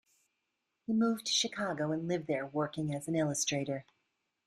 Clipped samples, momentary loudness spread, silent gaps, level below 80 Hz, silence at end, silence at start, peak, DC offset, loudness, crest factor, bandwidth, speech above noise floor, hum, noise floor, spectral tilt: under 0.1%; 7 LU; none; -74 dBFS; 0.65 s; 0.9 s; -18 dBFS; under 0.1%; -33 LUFS; 16 dB; 14 kHz; 51 dB; none; -84 dBFS; -4 dB/octave